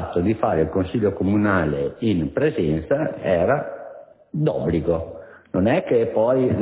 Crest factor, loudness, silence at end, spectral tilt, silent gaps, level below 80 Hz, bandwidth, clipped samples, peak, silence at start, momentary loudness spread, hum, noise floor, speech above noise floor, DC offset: 16 dB; -21 LUFS; 0 s; -12 dB/octave; none; -40 dBFS; 4 kHz; under 0.1%; -6 dBFS; 0 s; 9 LU; none; -42 dBFS; 22 dB; under 0.1%